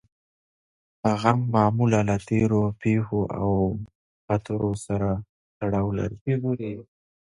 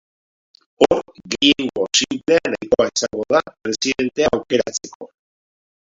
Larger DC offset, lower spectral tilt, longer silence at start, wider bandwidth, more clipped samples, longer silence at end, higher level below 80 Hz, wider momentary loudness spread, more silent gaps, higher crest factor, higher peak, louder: neither; first, -8 dB/octave vs -2.5 dB/octave; first, 1.05 s vs 0.8 s; first, 11.5 kHz vs 7.8 kHz; neither; second, 0.4 s vs 0.8 s; about the same, -48 dBFS vs -52 dBFS; about the same, 10 LU vs 9 LU; first, 3.95-4.28 s, 5.29-5.61 s, 6.21-6.26 s vs 4.95-5.00 s; about the same, 20 dB vs 20 dB; second, -4 dBFS vs 0 dBFS; second, -25 LUFS vs -18 LUFS